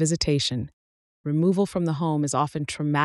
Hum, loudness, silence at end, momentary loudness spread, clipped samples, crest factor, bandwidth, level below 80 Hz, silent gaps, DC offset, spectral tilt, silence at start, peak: none; -25 LUFS; 0 s; 9 LU; under 0.1%; 16 dB; 12 kHz; -50 dBFS; 0.73-1.24 s; under 0.1%; -5 dB/octave; 0 s; -8 dBFS